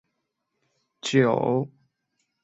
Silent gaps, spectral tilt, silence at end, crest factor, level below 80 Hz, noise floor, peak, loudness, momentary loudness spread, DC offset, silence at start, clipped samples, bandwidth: none; -6 dB/octave; 0.75 s; 22 dB; -68 dBFS; -79 dBFS; -6 dBFS; -24 LUFS; 13 LU; under 0.1%; 1.05 s; under 0.1%; 8.2 kHz